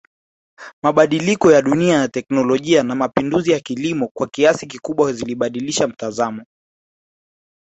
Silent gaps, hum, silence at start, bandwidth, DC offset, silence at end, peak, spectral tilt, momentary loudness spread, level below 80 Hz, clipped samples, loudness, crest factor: 0.73-0.82 s, 4.11-4.15 s; none; 0.6 s; 8.2 kHz; under 0.1%; 1.2 s; -2 dBFS; -5 dB/octave; 9 LU; -56 dBFS; under 0.1%; -17 LUFS; 16 dB